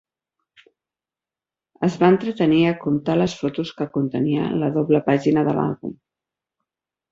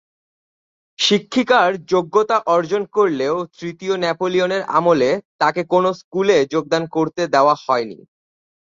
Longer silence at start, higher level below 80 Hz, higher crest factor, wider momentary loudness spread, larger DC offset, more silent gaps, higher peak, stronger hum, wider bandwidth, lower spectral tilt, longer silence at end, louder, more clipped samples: first, 1.8 s vs 1 s; about the same, -58 dBFS vs -62 dBFS; about the same, 18 dB vs 16 dB; about the same, 8 LU vs 6 LU; neither; second, none vs 5.25-5.39 s, 6.04-6.11 s; about the same, -2 dBFS vs -2 dBFS; neither; about the same, 7.6 kHz vs 7.8 kHz; first, -7.5 dB/octave vs -4.5 dB/octave; first, 1.2 s vs 0.7 s; about the same, -20 LUFS vs -18 LUFS; neither